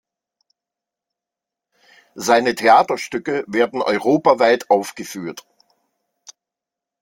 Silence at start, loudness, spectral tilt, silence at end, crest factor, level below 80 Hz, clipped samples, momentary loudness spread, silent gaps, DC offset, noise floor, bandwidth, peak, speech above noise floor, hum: 2.15 s; -17 LUFS; -4 dB/octave; 1.6 s; 20 dB; -66 dBFS; under 0.1%; 16 LU; none; under 0.1%; -86 dBFS; 16.5 kHz; 0 dBFS; 69 dB; none